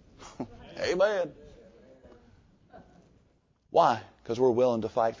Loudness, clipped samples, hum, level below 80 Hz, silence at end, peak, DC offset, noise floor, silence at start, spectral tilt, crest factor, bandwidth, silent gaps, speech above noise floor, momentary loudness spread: -27 LUFS; under 0.1%; none; -62 dBFS; 0.05 s; -10 dBFS; under 0.1%; -67 dBFS; 0.2 s; -5.5 dB/octave; 20 dB; 7.6 kHz; none; 42 dB; 18 LU